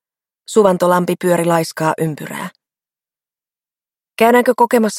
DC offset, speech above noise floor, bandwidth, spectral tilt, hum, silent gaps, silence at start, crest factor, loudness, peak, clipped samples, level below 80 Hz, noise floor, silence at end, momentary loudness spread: under 0.1%; over 76 dB; 16.5 kHz; -5.5 dB/octave; none; none; 0.5 s; 16 dB; -15 LUFS; 0 dBFS; under 0.1%; -62 dBFS; under -90 dBFS; 0 s; 15 LU